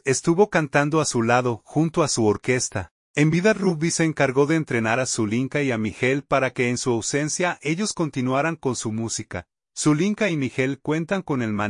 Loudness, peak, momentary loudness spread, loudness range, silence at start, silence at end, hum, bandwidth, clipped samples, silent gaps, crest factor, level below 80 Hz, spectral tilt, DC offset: -22 LUFS; -4 dBFS; 7 LU; 3 LU; 0.05 s; 0 s; none; 11 kHz; under 0.1%; 2.91-3.14 s; 18 dB; -58 dBFS; -5 dB/octave; under 0.1%